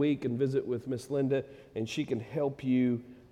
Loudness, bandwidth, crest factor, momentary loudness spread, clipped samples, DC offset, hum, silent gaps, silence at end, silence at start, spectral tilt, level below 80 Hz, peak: -32 LUFS; 12.5 kHz; 14 dB; 7 LU; under 0.1%; under 0.1%; none; none; 0.15 s; 0 s; -7.5 dB/octave; -66 dBFS; -18 dBFS